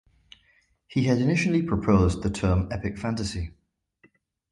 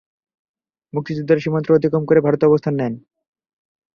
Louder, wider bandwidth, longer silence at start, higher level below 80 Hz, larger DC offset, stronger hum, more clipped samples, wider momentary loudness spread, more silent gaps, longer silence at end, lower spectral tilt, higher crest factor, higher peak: second, -25 LUFS vs -18 LUFS; first, 11.5 kHz vs 6.6 kHz; about the same, 0.9 s vs 0.95 s; first, -38 dBFS vs -58 dBFS; neither; neither; neither; second, 9 LU vs 12 LU; neither; about the same, 1 s vs 0.95 s; second, -7 dB/octave vs -9.5 dB/octave; about the same, 20 dB vs 18 dB; second, -6 dBFS vs -2 dBFS